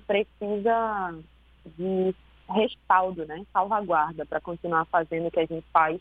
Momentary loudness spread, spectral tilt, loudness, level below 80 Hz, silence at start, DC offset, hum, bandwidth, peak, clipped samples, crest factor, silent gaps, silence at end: 9 LU; -8.5 dB/octave; -27 LUFS; -56 dBFS; 0.1 s; under 0.1%; none; 4.7 kHz; -6 dBFS; under 0.1%; 22 dB; none; 0 s